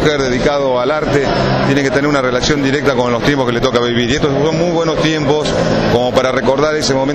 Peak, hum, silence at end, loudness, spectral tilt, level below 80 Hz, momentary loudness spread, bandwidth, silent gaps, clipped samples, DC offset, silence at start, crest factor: -2 dBFS; none; 0 s; -13 LUFS; -5 dB/octave; -32 dBFS; 1 LU; 13.5 kHz; none; under 0.1%; under 0.1%; 0 s; 12 dB